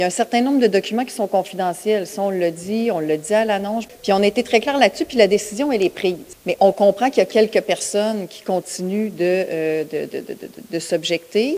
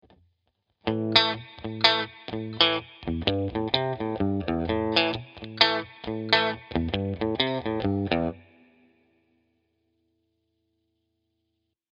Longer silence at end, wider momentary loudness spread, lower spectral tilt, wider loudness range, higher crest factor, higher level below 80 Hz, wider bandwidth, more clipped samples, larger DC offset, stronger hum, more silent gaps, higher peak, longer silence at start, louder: second, 0 s vs 3.5 s; second, 10 LU vs 13 LU; second, -4.5 dB/octave vs -6 dB/octave; about the same, 5 LU vs 7 LU; second, 18 dB vs 28 dB; second, -60 dBFS vs -50 dBFS; first, 16.5 kHz vs 8.2 kHz; neither; neither; neither; neither; about the same, 0 dBFS vs 0 dBFS; second, 0 s vs 0.85 s; first, -19 LUFS vs -25 LUFS